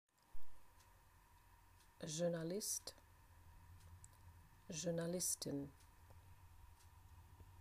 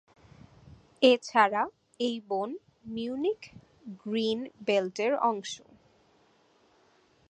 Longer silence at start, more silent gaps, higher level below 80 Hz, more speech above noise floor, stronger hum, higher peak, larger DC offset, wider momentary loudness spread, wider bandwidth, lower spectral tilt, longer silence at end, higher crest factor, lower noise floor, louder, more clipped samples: second, 0.3 s vs 0.65 s; neither; about the same, -68 dBFS vs -70 dBFS; second, 24 dB vs 37 dB; neither; second, -28 dBFS vs -8 dBFS; neither; first, 25 LU vs 20 LU; first, 15.5 kHz vs 9.4 kHz; about the same, -4 dB/octave vs -4 dB/octave; second, 0 s vs 1.75 s; about the same, 20 dB vs 24 dB; about the same, -68 dBFS vs -65 dBFS; second, -44 LUFS vs -29 LUFS; neither